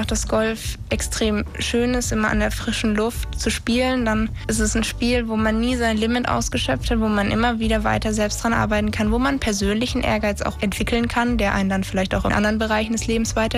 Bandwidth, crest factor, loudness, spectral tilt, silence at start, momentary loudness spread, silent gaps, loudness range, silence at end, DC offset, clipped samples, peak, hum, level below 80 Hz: 15.5 kHz; 12 dB; -21 LUFS; -4.5 dB/octave; 0 s; 4 LU; none; 1 LU; 0 s; under 0.1%; under 0.1%; -8 dBFS; none; -30 dBFS